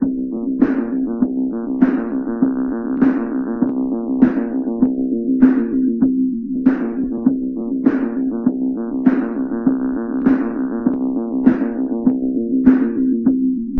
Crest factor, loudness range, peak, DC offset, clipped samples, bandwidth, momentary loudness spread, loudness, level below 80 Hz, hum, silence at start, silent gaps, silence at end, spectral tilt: 18 dB; 2 LU; 0 dBFS; under 0.1%; under 0.1%; 2.9 kHz; 7 LU; -18 LUFS; -46 dBFS; none; 0 s; none; 0 s; -11 dB/octave